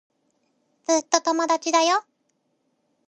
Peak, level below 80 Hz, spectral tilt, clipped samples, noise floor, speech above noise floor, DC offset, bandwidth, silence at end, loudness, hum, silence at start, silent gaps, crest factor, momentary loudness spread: -2 dBFS; -82 dBFS; 0 dB/octave; under 0.1%; -72 dBFS; 50 dB; under 0.1%; 9.6 kHz; 1.1 s; -22 LUFS; none; 0.9 s; none; 22 dB; 5 LU